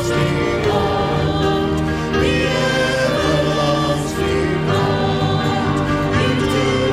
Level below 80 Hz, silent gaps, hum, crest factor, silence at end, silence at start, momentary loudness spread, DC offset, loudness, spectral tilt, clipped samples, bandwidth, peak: -32 dBFS; none; none; 12 dB; 0 s; 0 s; 2 LU; under 0.1%; -17 LUFS; -5.5 dB/octave; under 0.1%; 14.5 kHz; -6 dBFS